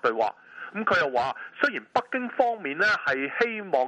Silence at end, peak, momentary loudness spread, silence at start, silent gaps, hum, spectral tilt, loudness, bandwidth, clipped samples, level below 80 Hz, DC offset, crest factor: 0 s; -6 dBFS; 7 LU; 0.05 s; none; none; -4.5 dB/octave; -26 LUFS; 9.6 kHz; under 0.1%; -68 dBFS; under 0.1%; 20 dB